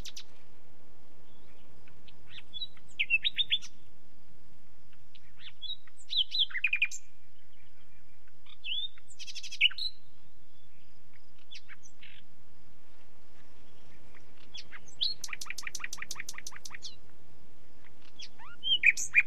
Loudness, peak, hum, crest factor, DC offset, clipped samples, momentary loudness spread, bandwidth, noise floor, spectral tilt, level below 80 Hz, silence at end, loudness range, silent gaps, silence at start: -31 LUFS; -10 dBFS; none; 26 dB; 3%; under 0.1%; 24 LU; 16 kHz; -65 dBFS; 0.5 dB/octave; -70 dBFS; 0 s; 9 LU; none; 0.05 s